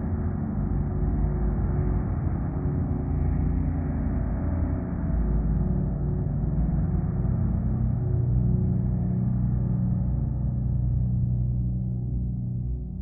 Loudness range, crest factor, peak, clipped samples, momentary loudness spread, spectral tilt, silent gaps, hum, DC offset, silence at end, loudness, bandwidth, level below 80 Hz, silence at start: 2 LU; 12 dB; -12 dBFS; under 0.1%; 3 LU; -15 dB/octave; none; none; under 0.1%; 0 s; -27 LUFS; 2.4 kHz; -30 dBFS; 0 s